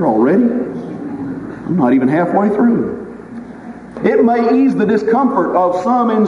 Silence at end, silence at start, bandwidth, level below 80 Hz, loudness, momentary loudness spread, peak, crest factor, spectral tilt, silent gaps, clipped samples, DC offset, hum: 0 s; 0 s; 7.4 kHz; -50 dBFS; -14 LUFS; 18 LU; 0 dBFS; 14 dB; -9 dB/octave; none; under 0.1%; under 0.1%; none